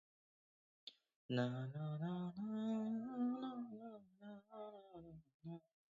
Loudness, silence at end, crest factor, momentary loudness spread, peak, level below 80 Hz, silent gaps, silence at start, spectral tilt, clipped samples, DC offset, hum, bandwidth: -46 LUFS; 0.4 s; 20 dB; 17 LU; -26 dBFS; -84 dBFS; 1.16-1.29 s, 5.34-5.40 s; 0.85 s; -7 dB/octave; under 0.1%; under 0.1%; none; 7.4 kHz